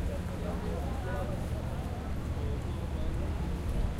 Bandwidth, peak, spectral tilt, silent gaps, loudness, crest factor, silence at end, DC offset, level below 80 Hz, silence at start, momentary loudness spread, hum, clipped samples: 15.5 kHz; -20 dBFS; -7 dB/octave; none; -36 LUFS; 12 dB; 0 s; under 0.1%; -36 dBFS; 0 s; 2 LU; none; under 0.1%